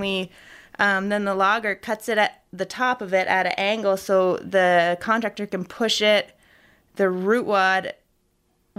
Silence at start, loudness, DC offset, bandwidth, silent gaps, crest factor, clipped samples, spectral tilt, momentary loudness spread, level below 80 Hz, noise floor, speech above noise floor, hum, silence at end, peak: 0 s; -22 LUFS; under 0.1%; 15.5 kHz; none; 18 dB; under 0.1%; -4 dB/octave; 12 LU; -64 dBFS; -67 dBFS; 45 dB; none; 0.85 s; -4 dBFS